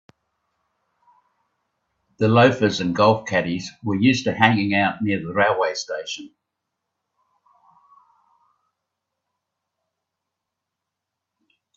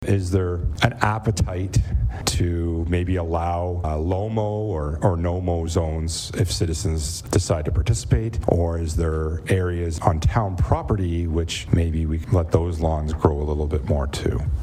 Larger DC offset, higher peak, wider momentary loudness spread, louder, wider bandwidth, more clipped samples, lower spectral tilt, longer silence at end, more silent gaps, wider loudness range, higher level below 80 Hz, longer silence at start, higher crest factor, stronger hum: neither; about the same, 0 dBFS vs -2 dBFS; first, 12 LU vs 4 LU; first, -20 LUFS vs -23 LUFS; second, 7.8 kHz vs 14.5 kHz; neither; about the same, -5.5 dB/octave vs -6 dB/octave; first, 5.5 s vs 0 s; neither; first, 12 LU vs 1 LU; second, -62 dBFS vs -30 dBFS; first, 2.2 s vs 0 s; about the same, 24 dB vs 20 dB; neither